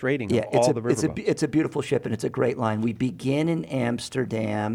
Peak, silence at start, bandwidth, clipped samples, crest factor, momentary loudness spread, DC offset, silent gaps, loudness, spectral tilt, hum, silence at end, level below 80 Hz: -8 dBFS; 0 s; 15.5 kHz; under 0.1%; 16 dB; 5 LU; under 0.1%; none; -25 LUFS; -6 dB/octave; none; 0 s; -58 dBFS